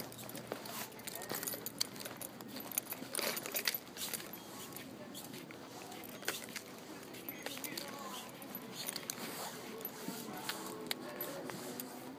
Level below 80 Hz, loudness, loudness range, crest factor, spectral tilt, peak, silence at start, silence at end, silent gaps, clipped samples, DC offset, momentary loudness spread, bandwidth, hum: -80 dBFS; -42 LUFS; 5 LU; 30 dB; -2 dB/octave; -14 dBFS; 0 s; 0 s; none; under 0.1%; under 0.1%; 10 LU; over 20 kHz; none